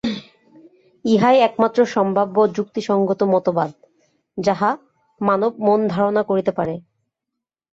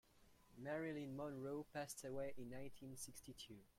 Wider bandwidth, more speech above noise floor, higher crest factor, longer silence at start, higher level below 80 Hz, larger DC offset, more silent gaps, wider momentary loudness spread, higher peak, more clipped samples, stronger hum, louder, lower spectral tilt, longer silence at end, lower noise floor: second, 7.8 kHz vs 16.5 kHz; first, 65 dB vs 21 dB; about the same, 16 dB vs 18 dB; about the same, 0.05 s vs 0.15 s; first, -60 dBFS vs -74 dBFS; neither; neither; first, 12 LU vs 9 LU; first, -4 dBFS vs -34 dBFS; neither; neither; first, -19 LUFS vs -51 LUFS; first, -7 dB/octave vs -4.5 dB/octave; first, 0.95 s vs 0.05 s; first, -82 dBFS vs -72 dBFS